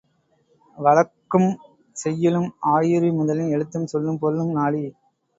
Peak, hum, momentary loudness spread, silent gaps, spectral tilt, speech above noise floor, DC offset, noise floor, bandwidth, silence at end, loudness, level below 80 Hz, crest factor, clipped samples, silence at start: -2 dBFS; none; 10 LU; none; -7.5 dB/octave; 43 dB; under 0.1%; -64 dBFS; 8 kHz; 0.45 s; -21 LUFS; -66 dBFS; 18 dB; under 0.1%; 0.75 s